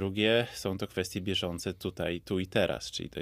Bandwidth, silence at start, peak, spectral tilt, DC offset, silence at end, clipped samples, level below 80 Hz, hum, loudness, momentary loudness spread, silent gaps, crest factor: 16 kHz; 0 s; -12 dBFS; -4.5 dB/octave; under 0.1%; 0 s; under 0.1%; -56 dBFS; none; -32 LUFS; 9 LU; none; 20 dB